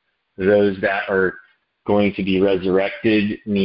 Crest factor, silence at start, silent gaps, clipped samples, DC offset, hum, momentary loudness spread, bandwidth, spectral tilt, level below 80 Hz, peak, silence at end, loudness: 16 dB; 0.4 s; none; under 0.1%; under 0.1%; none; 6 LU; 5.6 kHz; -11.5 dB/octave; -48 dBFS; -4 dBFS; 0 s; -19 LUFS